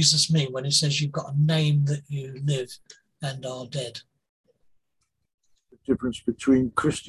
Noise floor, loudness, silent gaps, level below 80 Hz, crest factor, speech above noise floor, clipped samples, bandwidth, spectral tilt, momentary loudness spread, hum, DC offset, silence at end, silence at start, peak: -77 dBFS; -25 LUFS; 4.29-4.44 s, 5.34-5.38 s; -56 dBFS; 20 dB; 52 dB; under 0.1%; 12.5 kHz; -4.5 dB/octave; 14 LU; none; under 0.1%; 0 s; 0 s; -6 dBFS